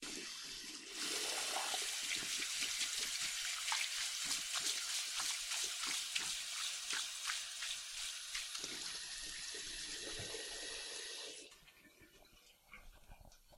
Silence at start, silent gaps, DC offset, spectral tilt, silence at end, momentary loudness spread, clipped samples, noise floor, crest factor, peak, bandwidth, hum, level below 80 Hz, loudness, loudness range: 0 s; none; under 0.1%; 1.5 dB/octave; 0 s; 9 LU; under 0.1%; -66 dBFS; 22 dB; -22 dBFS; 16 kHz; none; -68 dBFS; -40 LUFS; 8 LU